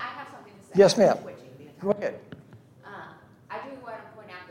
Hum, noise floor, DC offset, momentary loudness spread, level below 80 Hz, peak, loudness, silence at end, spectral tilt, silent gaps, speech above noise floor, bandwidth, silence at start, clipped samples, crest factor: none; -51 dBFS; under 0.1%; 25 LU; -72 dBFS; -6 dBFS; -23 LUFS; 0.05 s; -5 dB/octave; none; 30 dB; 16 kHz; 0 s; under 0.1%; 22 dB